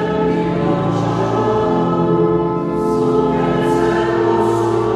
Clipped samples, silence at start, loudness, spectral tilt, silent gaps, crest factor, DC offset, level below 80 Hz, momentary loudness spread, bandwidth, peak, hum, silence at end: under 0.1%; 0 s; -16 LUFS; -7.5 dB/octave; none; 12 dB; under 0.1%; -40 dBFS; 2 LU; 12 kHz; -4 dBFS; none; 0 s